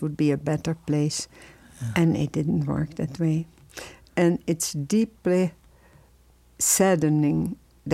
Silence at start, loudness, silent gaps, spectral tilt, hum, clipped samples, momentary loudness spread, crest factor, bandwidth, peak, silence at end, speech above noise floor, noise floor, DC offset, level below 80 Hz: 0 s; -24 LUFS; none; -5.5 dB/octave; none; under 0.1%; 14 LU; 18 dB; 16.5 kHz; -8 dBFS; 0 s; 33 dB; -57 dBFS; under 0.1%; -54 dBFS